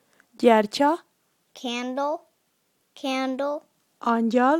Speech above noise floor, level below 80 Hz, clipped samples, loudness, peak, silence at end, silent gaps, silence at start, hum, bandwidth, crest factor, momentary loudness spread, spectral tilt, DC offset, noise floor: 48 dB; -80 dBFS; under 0.1%; -25 LUFS; -4 dBFS; 0 s; none; 0.4 s; none; 15 kHz; 20 dB; 14 LU; -4.5 dB/octave; under 0.1%; -70 dBFS